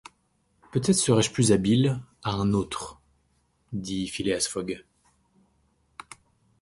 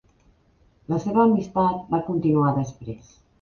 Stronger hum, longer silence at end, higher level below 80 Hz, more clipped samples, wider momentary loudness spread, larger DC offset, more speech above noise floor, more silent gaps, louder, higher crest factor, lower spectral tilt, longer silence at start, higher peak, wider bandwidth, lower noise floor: neither; first, 1.8 s vs 0.45 s; about the same, -52 dBFS vs -54 dBFS; neither; about the same, 17 LU vs 17 LU; neither; first, 45 dB vs 38 dB; neither; second, -25 LUFS vs -22 LUFS; about the same, 20 dB vs 18 dB; second, -5 dB/octave vs -9 dB/octave; second, 0.75 s vs 0.9 s; about the same, -8 dBFS vs -6 dBFS; first, 11.5 kHz vs 7 kHz; first, -69 dBFS vs -60 dBFS